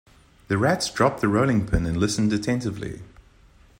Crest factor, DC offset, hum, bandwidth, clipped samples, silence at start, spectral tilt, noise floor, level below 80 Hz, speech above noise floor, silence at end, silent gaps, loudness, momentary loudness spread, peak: 18 dB; under 0.1%; none; 16 kHz; under 0.1%; 0.5 s; -5.5 dB/octave; -54 dBFS; -40 dBFS; 31 dB; 0.75 s; none; -23 LUFS; 11 LU; -6 dBFS